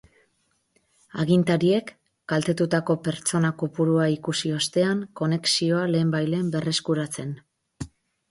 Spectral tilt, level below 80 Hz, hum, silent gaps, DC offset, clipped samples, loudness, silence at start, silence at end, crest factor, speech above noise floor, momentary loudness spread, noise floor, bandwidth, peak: -5 dB/octave; -60 dBFS; none; none; under 0.1%; under 0.1%; -24 LUFS; 1.15 s; 0.45 s; 16 dB; 47 dB; 17 LU; -70 dBFS; 11.5 kHz; -8 dBFS